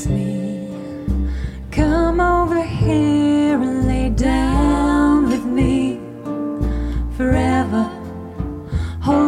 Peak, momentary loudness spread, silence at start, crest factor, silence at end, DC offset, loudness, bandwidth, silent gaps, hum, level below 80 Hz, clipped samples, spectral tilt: -2 dBFS; 12 LU; 0 s; 14 dB; 0 s; under 0.1%; -19 LUFS; 11.5 kHz; none; none; -26 dBFS; under 0.1%; -7.5 dB/octave